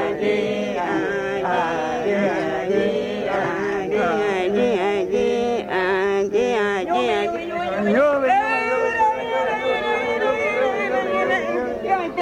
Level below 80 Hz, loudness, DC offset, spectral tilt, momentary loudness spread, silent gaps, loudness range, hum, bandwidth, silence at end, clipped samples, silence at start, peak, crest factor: -54 dBFS; -21 LUFS; under 0.1%; -5.5 dB/octave; 5 LU; none; 2 LU; none; 11 kHz; 0 s; under 0.1%; 0 s; -8 dBFS; 14 dB